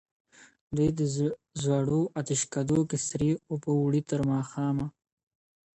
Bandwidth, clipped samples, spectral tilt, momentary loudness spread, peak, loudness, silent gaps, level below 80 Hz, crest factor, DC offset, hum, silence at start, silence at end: 8.8 kHz; under 0.1%; -6 dB/octave; 5 LU; -14 dBFS; -29 LUFS; 0.61-0.67 s; -58 dBFS; 14 dB; under 0.1%; none; 0.4 s; 0.85 s